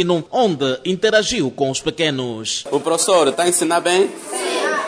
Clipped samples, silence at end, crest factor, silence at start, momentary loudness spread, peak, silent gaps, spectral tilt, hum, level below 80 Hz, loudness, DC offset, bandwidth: under 0.1%; 0 s; 14 dB; 0 s; 7 LU; -4 dBFS; none; -3 dB/octave; none; -54 dBFS; -18 LUFS; under 0.1%; 11 kHz